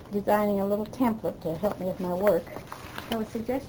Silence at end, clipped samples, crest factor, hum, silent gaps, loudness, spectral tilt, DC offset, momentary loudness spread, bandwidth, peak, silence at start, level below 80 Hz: 0 s; under 0.1%; 20 dB; none; none; -28 LUFS; -6.5 dB/octave; under 0.1%; 13 LU; over 20 kHz; -8 dBFS; 0 s; -54 dBFS